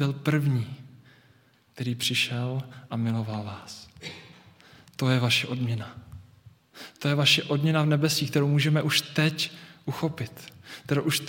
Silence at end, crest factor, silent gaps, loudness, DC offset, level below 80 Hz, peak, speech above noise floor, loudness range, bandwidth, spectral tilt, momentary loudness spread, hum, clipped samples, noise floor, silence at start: 0 s; 20 dB; none; -26 LUFS; under 0.1%; -68 dBFS; -8 dBFS; 34 dB; 7 LU; 17 kHz; -5 dB/octave; 20 LU; none; under 0.1%; -61 dBFS; 0 s